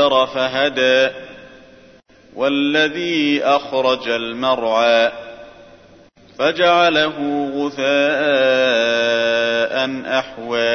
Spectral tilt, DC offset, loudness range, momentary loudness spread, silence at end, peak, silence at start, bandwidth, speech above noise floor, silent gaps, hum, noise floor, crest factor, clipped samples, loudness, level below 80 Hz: -4 dB/octave; under 0.1%; 3 LU; 7 LU; 0 s; -2 dBFS; 0 s; 6.6 kHz; 31 dB; none; none; -47 dBFS; 16 dB; under 0.1%; -17 LUFS; -58 dBFS